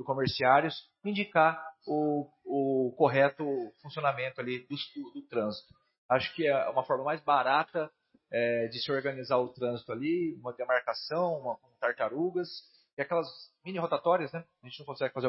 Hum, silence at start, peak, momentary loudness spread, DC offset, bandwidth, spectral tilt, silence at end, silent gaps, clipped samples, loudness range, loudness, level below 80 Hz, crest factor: none; 0 s; -10 dBFS; 14 LU; under 0.1%; 5.8 kHz; -9 dB/octave; 0 s; 5.98-6.09 s, 12.93-12.97 s; under 0.1%; 4 LU; -31 LUFS; -72 dBFS; 22 dB